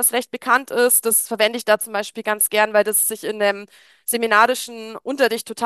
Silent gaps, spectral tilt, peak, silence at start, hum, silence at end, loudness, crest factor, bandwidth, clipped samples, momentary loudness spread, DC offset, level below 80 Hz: none; -1 dB/octave; 0 dBFS; 0 s; none; 0 s; -18 LUFS; 18 dB; 13 kHz; under 0.1%; 10 LU; under 0.1%; -74 dBFS